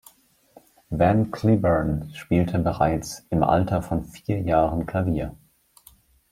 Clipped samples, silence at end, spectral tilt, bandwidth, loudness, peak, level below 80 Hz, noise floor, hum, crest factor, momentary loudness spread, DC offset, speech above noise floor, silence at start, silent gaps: under 0.1%; 0.95 s; -7.5 dB/octave; 16 kHz; -23 LUFS; -4 dBFS; -42 dBFS; -55 dBFS; none; 20 dB; 9 LU; under 0.1%; 33 dB; 0.9 s; none